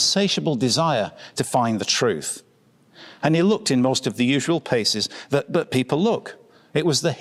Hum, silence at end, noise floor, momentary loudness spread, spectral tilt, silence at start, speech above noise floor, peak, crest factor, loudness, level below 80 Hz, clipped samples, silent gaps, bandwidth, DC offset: none; 0 s; -56 dBFS; 8 LU; -4 dB/octave; 0 s; 35 dB; -4 dBFS; 18 dB; -21 LUFS; -64 dBFS; under 0.1%; none; 15 kHz; under 0.1%